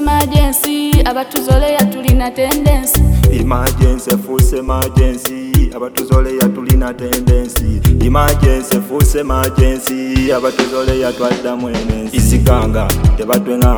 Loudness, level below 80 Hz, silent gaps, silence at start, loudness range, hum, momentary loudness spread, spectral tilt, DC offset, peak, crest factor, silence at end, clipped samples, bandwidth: -13 LUFS; -16 dBFS; none; 0 s; 2 LU; none; 5 LU; -5.5 dB/octave; under 0.1%; 0 dBFS; 12 dB; 0 s; under 0.1%; over 20 kHz